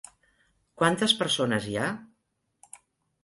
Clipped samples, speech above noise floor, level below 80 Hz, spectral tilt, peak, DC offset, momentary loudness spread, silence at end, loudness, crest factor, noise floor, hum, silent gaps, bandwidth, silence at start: under 0.1%; 51 dB; -64 dBFS; -3.5 dB/octave; -8 dBFS; under 0.1%; 9 LU; 0.5 s; -26 LUFS; 22 dB; -77 dBFS; none; none; 11.5 kHz; 0.8 s